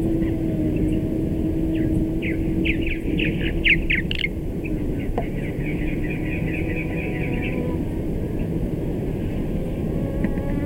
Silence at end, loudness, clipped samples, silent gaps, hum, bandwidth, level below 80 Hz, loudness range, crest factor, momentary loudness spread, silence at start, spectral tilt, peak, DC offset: 0 s; -24 LUFS; under 0.1%; none; none; 16 kHz; -30 dBFS; 4 LU; 16 dB; 5 LU; 0 s; -7.5 dB/octave; -6 dBFS; under 0.1%